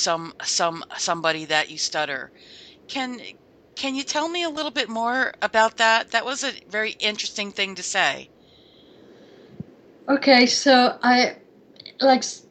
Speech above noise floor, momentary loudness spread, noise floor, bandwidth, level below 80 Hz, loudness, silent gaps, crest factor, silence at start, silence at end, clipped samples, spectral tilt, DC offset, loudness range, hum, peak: 31 dB; 17 LU; -53 dBFS; 9.2 kHz; -68 dBFS; -21 LUFS; none; 22 dB; 0 s; 0.1 s; under 0.1%; -2 dB/octave; under 0.1%; 7 LU; none; -2 dBFS